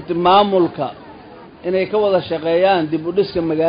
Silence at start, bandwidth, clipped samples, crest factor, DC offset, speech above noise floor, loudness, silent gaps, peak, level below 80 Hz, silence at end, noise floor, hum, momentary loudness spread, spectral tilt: 0 s; 5.2 kHz; under 0.1%; 14 dB; under 0.1%; 23 dB; -17 LUFS; none; -2 dBFS; -50 dBFS; 0 s; -39 dBFS; none; 10 LU; -11 dB/octave